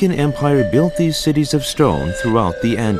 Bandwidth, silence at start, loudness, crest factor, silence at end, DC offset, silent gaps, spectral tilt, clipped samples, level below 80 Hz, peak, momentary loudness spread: 14.5 kHz; 0 s; -16 LUFS; 14 dB; 0 s; under 0.1%; none; -6 dB/octave; under 0.1%; -36 dBFS; -2 dBFS; 3 LU